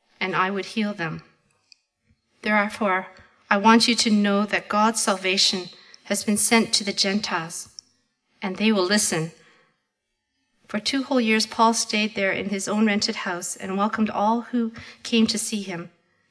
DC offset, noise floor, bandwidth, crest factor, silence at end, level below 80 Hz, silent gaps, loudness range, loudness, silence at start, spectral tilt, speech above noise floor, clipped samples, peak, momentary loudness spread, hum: under 0.1%; -78 dBFS; 11 kHz; 22 dB; 0.45 s; -66 dBFS; none; 6 LU; -22 LUFS; 0.2 s; -3 dB/octave; 55 dB; under 0.1%; -2 dBFS; 13 LU; none